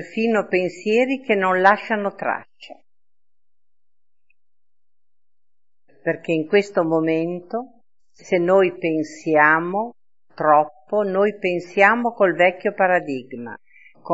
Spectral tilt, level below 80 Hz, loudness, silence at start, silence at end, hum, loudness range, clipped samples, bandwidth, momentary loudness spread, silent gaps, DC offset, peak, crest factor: -6 dB/octave; -72 dBFS; -20 LUFS; 0 s; 0 s; none; 11 LU; under 0.1%; 8 kHz; 13 LU; none; 0.3%; 0 dBFS; 20 dB